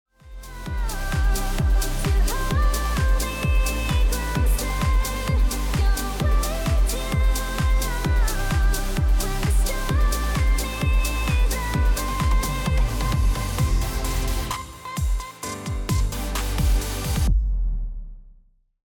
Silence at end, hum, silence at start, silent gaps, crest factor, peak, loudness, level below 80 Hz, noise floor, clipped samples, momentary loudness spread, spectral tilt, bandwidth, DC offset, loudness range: 0.55 s; none; 0.25 s; none; 10 dB; -12 dBFS; -24 LUFS; -22 dBFS; -55 dBFS; under 0.1%; 6 LU; -4.5 dB/octave; 18.5 kHz; under 0.1%; 3 LU